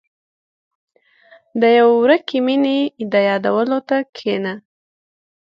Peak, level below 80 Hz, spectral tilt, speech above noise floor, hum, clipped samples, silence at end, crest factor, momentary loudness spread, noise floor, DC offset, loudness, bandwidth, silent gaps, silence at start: -2 dBFS; -70 dBFS; -7 dB/octave; 35 dB; none; under 0.1%; 1 s; 18 dB; 11 LU; -50 dBFS; under 0.1%; -16 LUFS; 6.2 kHz; 4.09-4.13 s; 1.55 s